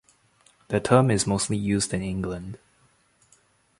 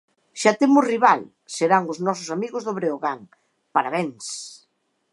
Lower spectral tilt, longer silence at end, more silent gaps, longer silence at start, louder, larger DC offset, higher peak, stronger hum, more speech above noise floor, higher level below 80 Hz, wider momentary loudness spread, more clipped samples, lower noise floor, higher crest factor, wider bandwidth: about the same, -5 dB/octave vs -4.5 dB/octave; first, 1.25 s vs 0.55 s; neither; first, 0.7 s vs 0.35 s; about the same, -24 LUFS vs -22 LUFS; neither; about the same, -4 dBFS vs -2 dBFS; neither; second, 40 dB vs 48 dB; first, -50 dBFS vs -78 dBFS; about the same, 16 LU vs 16 LU; neither; second, -63 dBFS vs -69 dBFS; about the same, 24 dB vs 20 dB; about the same, 11.5 kHz vs 11.5 kHz